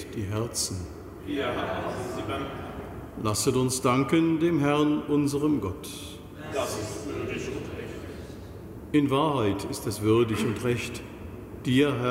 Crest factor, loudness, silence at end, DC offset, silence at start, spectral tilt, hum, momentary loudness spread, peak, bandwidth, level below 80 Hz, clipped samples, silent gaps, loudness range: 16 dB; -27 LUFS; 0 s; under 0.1%; 0 s; -5.5 dB/octave; none; 17 LU; -10 dBFS; 16 kHz; -50 dBFS; under 0.1%; none; 7 LU